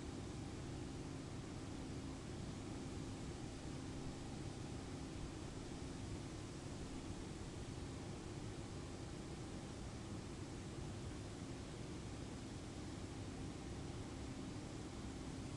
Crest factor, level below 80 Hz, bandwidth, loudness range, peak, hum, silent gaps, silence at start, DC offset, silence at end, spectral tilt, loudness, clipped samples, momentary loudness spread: 14 dB; -58 dBFS; 11.5 kHz; 1 LU; -36 dBFS; none; none; 0 s; under 0.1%; 0 s; -5.5 dB/octave; -50 LUFS; under 0.1%; 1 LU